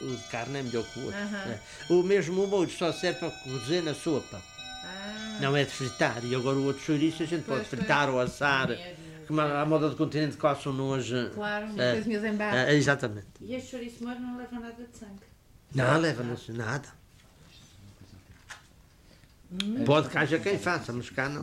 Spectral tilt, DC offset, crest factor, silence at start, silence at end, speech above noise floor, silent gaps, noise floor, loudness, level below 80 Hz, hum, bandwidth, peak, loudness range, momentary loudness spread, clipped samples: -5.5 dB/octave; under 0.1%; 20 dB; 0 s; 0 s; 28 dB; none; -57 dBFS; -29 LUFS; -60 dBFS; none; 15.5 kHz; -10 dBFS; 5 LU; 15 LU; under 0.1%